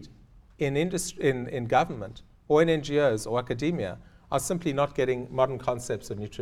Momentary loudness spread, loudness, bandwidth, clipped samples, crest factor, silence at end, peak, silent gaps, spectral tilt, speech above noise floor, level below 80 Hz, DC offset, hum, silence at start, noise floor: 10 LU; -27 LUFS; 16 kHz; under 0.1%; 20 dB; 0 s; -8 dBFS; none; -5.5 dB/octave; 27 dB; -52 dBFS; under 0.1%; none; 0 s; -54 dBFS